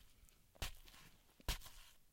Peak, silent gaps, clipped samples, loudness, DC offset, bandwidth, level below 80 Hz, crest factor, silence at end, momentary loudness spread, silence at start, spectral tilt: -28 dBFS; none; under 0.1%; -50 LUFS; under 0.1%; 16.5 kHz; -54 dBFS; 24 dB; 0 s; 21 LU; 0 s; -2.5 dB/octave